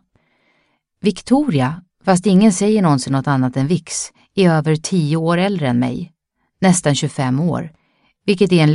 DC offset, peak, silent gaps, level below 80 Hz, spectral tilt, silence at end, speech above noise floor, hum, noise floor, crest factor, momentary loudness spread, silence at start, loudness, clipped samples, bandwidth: under 0.1%; 0 dBFS; none; -52 dBFS; -6 dB/octave; 0 s; 49 dB; none; -64 dBFS; 16 dB; 11 LU; 1.05 s; -17 LUFS; under 0.1%; 11.5 kHz